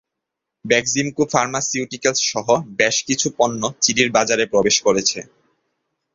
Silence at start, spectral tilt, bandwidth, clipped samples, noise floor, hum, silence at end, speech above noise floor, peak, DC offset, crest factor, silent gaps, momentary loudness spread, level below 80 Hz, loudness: 0.65 s; -2.5 dB/octave; 7.8 kHz; under 0.1%; -81 dBFS; none; 0.9 s; 63 dB; 0 dBFS; under 0.1%; 20 dB; none; 5 LU; -58 dBFS; -18 LUFS